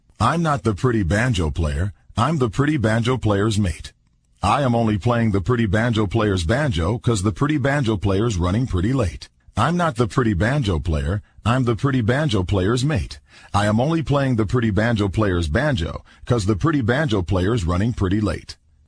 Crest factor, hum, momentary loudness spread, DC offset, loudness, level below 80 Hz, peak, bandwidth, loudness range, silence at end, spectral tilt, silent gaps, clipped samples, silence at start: 16 dB; none; 6 LU; under 0.1%; -20 LUFS; -34 dBFS; -4 dBFS; 10.5 kHz; 1 LU; 0.35 s; -6.5 dB/octave; none; under 0.1%; 0.2 s